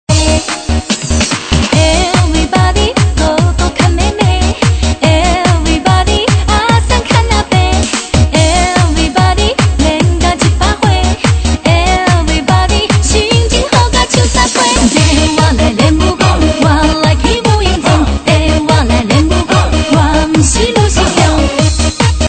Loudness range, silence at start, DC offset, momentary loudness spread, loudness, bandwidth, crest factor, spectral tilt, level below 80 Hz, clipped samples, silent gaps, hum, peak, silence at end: 1 LU; 0.1 s; under 0.1%; 2 LU; -10 LUFS; 9.2 kHz; 10 dB; -4.5 dB/octave; -16 dBFS; 0.2%; none; none; 0 dBFS; 0 s